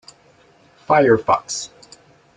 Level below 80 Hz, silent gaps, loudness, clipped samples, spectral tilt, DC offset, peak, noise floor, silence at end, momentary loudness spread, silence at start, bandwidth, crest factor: -58 dBFS; none; -17 LUFS; under 0.1%; -4.5 dB/octave; under 0.1%; -2 dBFS; -53 dBFS; 0.7 s; 13 LU; 0.9 s; 9.4 kHz; 18 dB